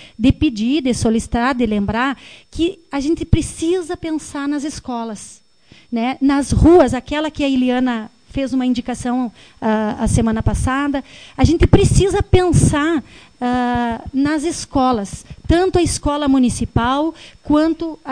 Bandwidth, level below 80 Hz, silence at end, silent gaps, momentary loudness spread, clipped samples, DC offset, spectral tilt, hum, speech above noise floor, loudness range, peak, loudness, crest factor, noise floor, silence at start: 10.5 kHz; -28 dBFS; 0 s; none; 11 LU; under 0.1%; under 0.1%; -6 dB/octave; none; 33 dB; 5 LU; 0 dBFS; -17 LUFS; 16 dB; -49 dBFS; 0 s